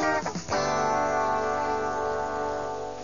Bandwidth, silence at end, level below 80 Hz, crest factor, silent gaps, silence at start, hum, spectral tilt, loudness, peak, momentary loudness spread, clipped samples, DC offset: 7.4 kHz; 0 s; -52 dBFS; 14 dB; none; 0 s; 50 Hz at -50 dBFS; -4 dB/octave; -27 LUFS; -14 dBFS; 5 LU; under 0.1%; 0.5%